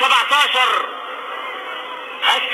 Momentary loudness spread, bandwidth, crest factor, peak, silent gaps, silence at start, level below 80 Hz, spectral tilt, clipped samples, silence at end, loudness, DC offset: 15 LU; 19.5 kHz; 16 dB; -4 dBFS; none; 0 s; -80 dBFS; 2 dB/octave; under 0.1%; 0 s; -17 LUFS; under 0.1%